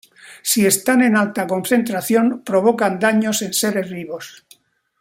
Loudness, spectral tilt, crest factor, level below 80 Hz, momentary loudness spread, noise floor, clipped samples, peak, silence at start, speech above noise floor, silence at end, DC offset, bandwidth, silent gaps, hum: -17 LUFS; -3.5 dB/octave; 16 dB; -64 dBFS; 13 LU; -53 dBFS; under 0.1%; -2 dBFS; 0.25 s; 35 dB; 0.7 s; under 0.1%; 16.5 kHz; none; none